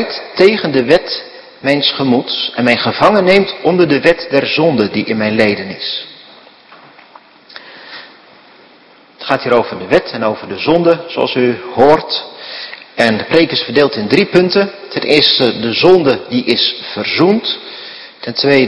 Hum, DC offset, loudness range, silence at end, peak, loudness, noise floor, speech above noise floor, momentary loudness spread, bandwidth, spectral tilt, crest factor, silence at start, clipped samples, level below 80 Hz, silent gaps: none; under 0.1%; 8 LU; 0 s; 0 dBFS; -12 LUFS; -44 dBFS; 32 dB; 16 LU; 11 kHz; -6 dB/octave; 14 dB; 0 s; 0.5%; -50 dBFS; none